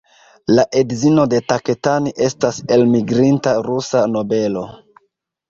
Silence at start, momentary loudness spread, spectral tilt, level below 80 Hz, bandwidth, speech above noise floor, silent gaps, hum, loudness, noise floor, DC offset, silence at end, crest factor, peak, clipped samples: 0.5 s; 6 LU; -6 dB/octave; -54 dBFS; 7.6 kHz; 52 dB; none; none; -16 LUFS; -67 dBFS; under 0.1%; 0.75 s; 14 dB; -2 dBFS; under 0.1%